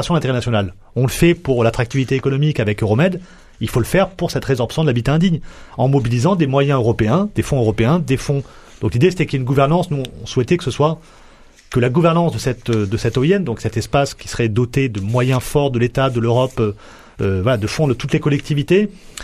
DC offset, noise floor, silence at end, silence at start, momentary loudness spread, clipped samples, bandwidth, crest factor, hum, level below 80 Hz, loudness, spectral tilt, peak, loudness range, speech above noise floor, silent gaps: under 0.1%; -44 dBFS; 0 s; 0 s; 7 LU; under 0.1%; 14 kHz; 16 dB; none; -38 dBFS; -17 LUFS; -6.5 dB/octave; -2 dBFS; 2 LU; 28 dB; none